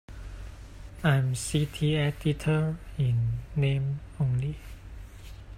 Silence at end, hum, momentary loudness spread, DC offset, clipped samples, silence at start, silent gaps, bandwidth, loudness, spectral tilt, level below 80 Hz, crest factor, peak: 0 s; none; 20 LU; under 0.1%; under 0.1%; 0.1 s; none; 14.5 kHz; -28 LUFS; -6 dB/octave; -44 dBFS; 18 dB; -12 dBFS